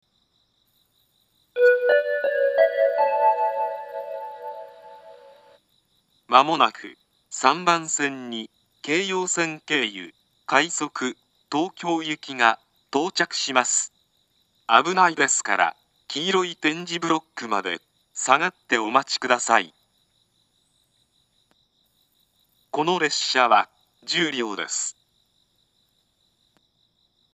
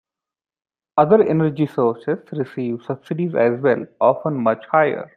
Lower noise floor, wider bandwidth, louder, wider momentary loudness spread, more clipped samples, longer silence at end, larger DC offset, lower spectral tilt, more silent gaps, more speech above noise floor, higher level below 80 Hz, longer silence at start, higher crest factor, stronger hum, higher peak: second, -68 dBFS vs -89 dBFS; first, 14.5 kHz vs 4.6 kHz; second, -22 LUFS vs -19 LUFS; first, 16 LU vs 11 LU; neither; first, 2.4 s vs 0.1 s; neither; second, -2 dB/octave vs -10 dB/octave; neither; second, 45 dB vs 70 dB; second, -82 dBFS vs -64 dBFS; first, 1.55 s vs 0.95 s; first, 24 dB vs 18 dB; neither; about the same, 0 dBFS vs -2 dBFS